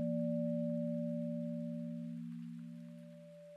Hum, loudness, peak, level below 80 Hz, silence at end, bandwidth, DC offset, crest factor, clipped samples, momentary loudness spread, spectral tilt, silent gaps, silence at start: none; -41 LUFS; -28 dBFS; under -90 dBFS; 0 s; 4.8 kHz; under 0.1%; 12 dB; under 0.1%; 16 LU; -10.5 dB/octave; none; 0 s